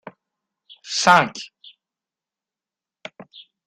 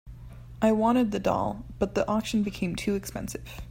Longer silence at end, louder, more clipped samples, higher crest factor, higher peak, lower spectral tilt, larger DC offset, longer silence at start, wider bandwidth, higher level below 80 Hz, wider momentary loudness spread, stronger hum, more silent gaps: first, 2.2 s vs 0 s; first, -17 LUFS vs -27 LUFS; neither; first, 24 dB vs 16 dB; first, 0 dBFS vs -10 dBFS; second, -2.5 dB/octave vs -6 dB/octave; neither; first, 0.85 s vs 0.05 s; second, 13 kHz vs 16.5 kHz; second, -66 dBFS vs -46 dBFS; first, 25 LU vs 15 LU; neither; neither